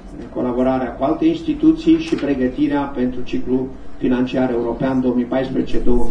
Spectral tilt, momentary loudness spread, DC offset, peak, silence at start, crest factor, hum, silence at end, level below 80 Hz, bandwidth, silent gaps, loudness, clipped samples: -7.5 dB/octave; 6 LU; under 0.1%; -2 dBFS; 0 s; 16 dB; none; 0 s; -30 dBFS; 9 kHz; none; -19 LUFS; under 0.1%